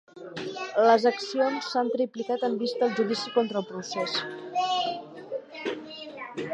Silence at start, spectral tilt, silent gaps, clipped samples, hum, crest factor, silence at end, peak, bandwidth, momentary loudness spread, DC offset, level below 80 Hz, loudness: 0.15 s; -4 dB/octave; none; under 0.1%; none; 20 dB; 0 s; -8 dBFS; 9 kHz; 15 LU; under 0.1%; -80 dBFS; -27 LUFS